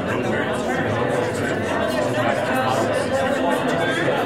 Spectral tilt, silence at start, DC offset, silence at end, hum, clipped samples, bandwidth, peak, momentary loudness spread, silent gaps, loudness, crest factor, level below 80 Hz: -5 dB/octave; 0 s; under 0.1%; 0 s; none; under 0.1%; 16 kHz; -6 dBFS; 2 LU; none; -21 LUFS; 14 dB; -50 dBFS